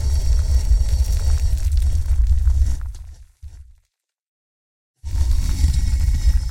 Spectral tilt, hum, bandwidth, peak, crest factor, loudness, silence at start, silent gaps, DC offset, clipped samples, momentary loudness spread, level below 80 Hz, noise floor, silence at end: -5.5 dB/octave; none; 15 kHz; -4 dBFS; 14 dB; -21 LUFS; 0 s; 4.27-4.94 s; under 0.1%; under 0.1%; 8 LU; -18 dBFS; -70 dBFS; 0 s